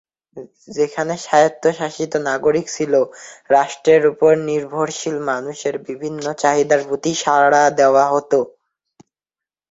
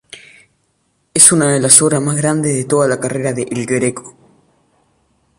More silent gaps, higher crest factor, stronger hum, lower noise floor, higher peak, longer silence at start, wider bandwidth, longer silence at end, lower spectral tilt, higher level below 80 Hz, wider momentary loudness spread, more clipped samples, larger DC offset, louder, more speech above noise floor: neither; about the same, 16 dB vs 16 dB; neither; first, -89 dBFS vs -63 dBFS; about the same, -2 dBFS vs 0 dBFS; first, 0.35 s vs 0.15 s; second, 8 kHz vs 16 kHz; about the same, 1.2 s vs 1.3 s; about the same, -4 dB/octave vs -3.5 dB/octave; second, -62 dBFS vs -54 dBFS; about the same, 11 LU vs 12 LU; second, under 0.1% vs 0.3%; neither; second, -17 LUFS vs -12 LUFS; first, 72 dB vs 49 dB